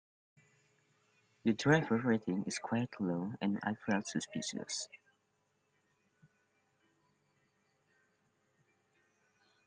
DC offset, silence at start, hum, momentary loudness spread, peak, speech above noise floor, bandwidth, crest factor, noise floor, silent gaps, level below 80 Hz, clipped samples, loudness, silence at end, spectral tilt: under 0.1%; 1.45 s; none; 10 LU; -14 dBFS; 44 dB; 10 kHz; 24 dB; -79 dBFS; none; -78 dBFS; under 0.1%; -36 LUFS; 4.7 s; -5 dB/octave